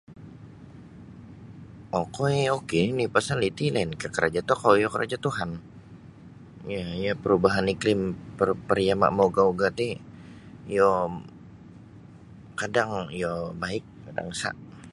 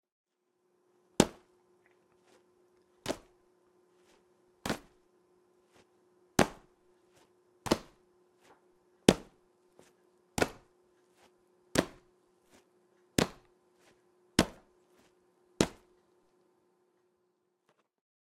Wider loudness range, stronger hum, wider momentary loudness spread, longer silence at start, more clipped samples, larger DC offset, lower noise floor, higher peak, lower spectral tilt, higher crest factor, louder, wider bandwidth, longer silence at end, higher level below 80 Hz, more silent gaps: second, 6 LU vs 11 LU; neither; first, 24 LU vs 14 LU; second, 0.1 s vs 1.2 s; neither; neither; second, -47 dBFS vs -78 dBFS; about the same, -4 dBFS vs -4 dBFS; first, -5.5 dB/octave vs -4 dB/octave; second, 22 dB vs 36 dB; first, -26 LUFS vs -33 LUFS; second, 11.5 kHz vs 16 kHz; second, 0 s vs 2.7 s; about the same, -54 dBFS vs -58 dBFS; neither